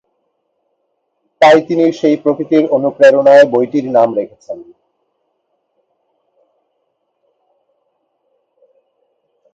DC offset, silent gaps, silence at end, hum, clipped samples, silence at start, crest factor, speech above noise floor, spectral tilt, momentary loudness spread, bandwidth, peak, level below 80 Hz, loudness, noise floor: under 0.1%; none; 4.9 s; none; under 0.1%; 1.4 s; 16 dB; 56 dB; -6 dB/octave; 17 LU; 8 kHz; 0 dBFS; -66 dBFS; -11 LUFS; -67 dBFS